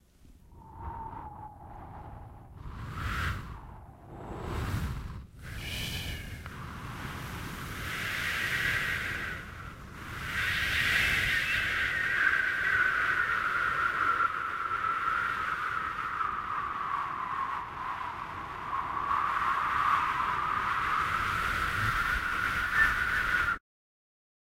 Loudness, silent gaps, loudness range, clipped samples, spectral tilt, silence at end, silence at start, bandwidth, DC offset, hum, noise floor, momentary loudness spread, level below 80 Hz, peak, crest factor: -30 LUFS; none; 11 LU; under 0.1%; -3.5 dB/octave; 1 s; 0.25 s; 16 kHz; under 0.1%; none; -56 dBFS; 18 LU; -46 dBFS; -12 dBFS; 20 dB